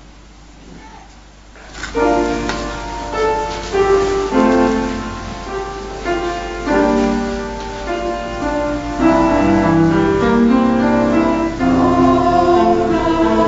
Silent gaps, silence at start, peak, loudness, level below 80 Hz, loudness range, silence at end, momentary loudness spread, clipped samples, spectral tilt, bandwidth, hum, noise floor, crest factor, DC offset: none; 0.3 s; -2 dBFS; -16 LUFS; -32 dBFS; 6 LU; 0 s; 12 LU; under 0.1%; -6 dB/octave; 8 kHz; none; -40 dBFS; 14 dB; under 0.1%